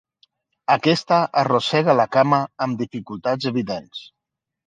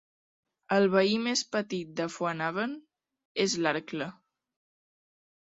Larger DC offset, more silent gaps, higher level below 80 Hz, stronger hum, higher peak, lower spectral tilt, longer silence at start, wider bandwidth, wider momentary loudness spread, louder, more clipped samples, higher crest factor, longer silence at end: neither; second, none vs 3.25-3.35 s; first, -64 dBFS vs -74 dBFS; neither; first, -2 dBFS vs -10 dBFS; first, -6 dB/octave vs -4 dB/octave; about the same, 0.7 s vs 0.7 s; first, 9.4 kHz vs 8.4 kHz; about the same, 12 LU vs 13 LU; first, -20 LUFS vs -29 LUFS; neither; about the same, 20 dB vs 22 dB; second, 0.65 s vs 1.3 s